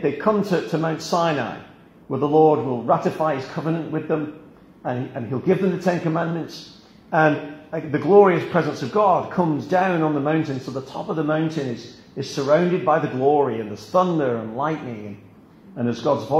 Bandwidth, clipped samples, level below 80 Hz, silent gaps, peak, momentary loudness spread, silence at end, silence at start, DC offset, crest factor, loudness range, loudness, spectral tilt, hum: 14 kHz; under 0.1%; -62 dBFS; none; -2 dBFS; 13 LU; 0 s; 0 s; under 0.1%; 20 dB; 5 LU; -21 LUFS; -7 dB/octave; none